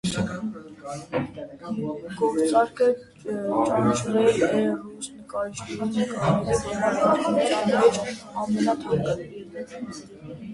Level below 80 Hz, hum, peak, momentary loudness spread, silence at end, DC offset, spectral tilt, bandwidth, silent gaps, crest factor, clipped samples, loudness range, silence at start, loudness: -54 dBFS; none; -6 dBFS; 17 LU; 0 s; under 0.1%; -5.5 dB/octave; 11.5 kHz; none; 18 dB; under 0.1%; 3 LU; 0.05 s; -24 LUFS